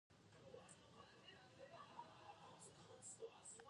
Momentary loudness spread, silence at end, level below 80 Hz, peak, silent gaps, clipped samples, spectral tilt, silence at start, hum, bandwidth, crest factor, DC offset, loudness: 7 LU; 0 s; -86 dBFS; -44 dBFS; none; under 0.1%; -2.5 dB/octave; 0.1 s; none; 11 kHz; 18 dB; under 0.1%; -61 LUFS